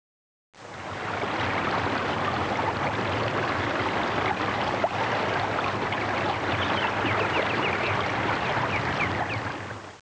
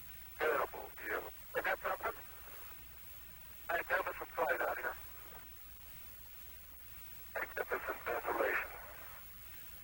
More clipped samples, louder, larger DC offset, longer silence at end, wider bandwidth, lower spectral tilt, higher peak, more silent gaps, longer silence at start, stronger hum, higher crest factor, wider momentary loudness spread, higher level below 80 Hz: neither; first, -26 LUFS vs -41 LUFS; neither; about the same, 0 s vs 0 s; second, 8 kHz vs over 20 kHz; first, -5 dB/octave vs -3.5 dB/octave; first, -14 dBFS vs -22 dBFS; neither; first, 0.55 s vs 0 s; neither; second, 14 dB vs 20 dB; second, 5 LU vs 14 LU; first, -48 dBFS vs -62 dBFS